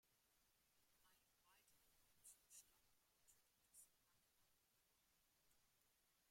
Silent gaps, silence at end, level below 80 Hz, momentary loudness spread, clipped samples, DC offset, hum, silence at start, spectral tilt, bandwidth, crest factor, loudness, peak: none; 0 s; under -90 dBFS; 4 LU; under 0.1%; under 0.1%; none; 0 s; 0 dB/octave; 16.5 kHz; 24 dB; -68 LUFS; -54 dBFS